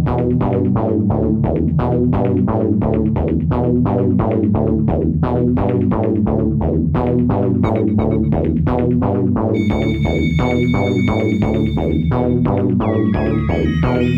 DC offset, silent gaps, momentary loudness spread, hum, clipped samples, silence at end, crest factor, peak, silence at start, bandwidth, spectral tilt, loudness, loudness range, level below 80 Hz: under 0.1%; none; 1 LU; none; under 0.1%; 0 s; 12 dB; -4 dBFS; 0 s; 7.2 kHz; -9.5 dB/octave; -16 LUFS; 0 LU; -28 dBFS